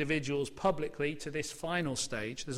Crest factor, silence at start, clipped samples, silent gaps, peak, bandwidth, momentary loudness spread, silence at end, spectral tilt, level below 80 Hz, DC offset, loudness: 18 dB; 0 s; under 0.1%; none; -18 dBFS; 16 kHz; 6 LU; 0 s; -4 dB/octave; -56 dBFS; under 0.1%; -34 LUFS